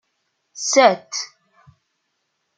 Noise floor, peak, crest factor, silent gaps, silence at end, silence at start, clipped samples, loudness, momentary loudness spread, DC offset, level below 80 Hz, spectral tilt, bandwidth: -73 dBFS; -2 dBFS; 22 dB; none; 1.3 s; 0.55 s; under 0.1%; -18 LUFS; 15 LU; under 0.1%; -72 dBFS; -1.5 dB/octave; 9.4 kHz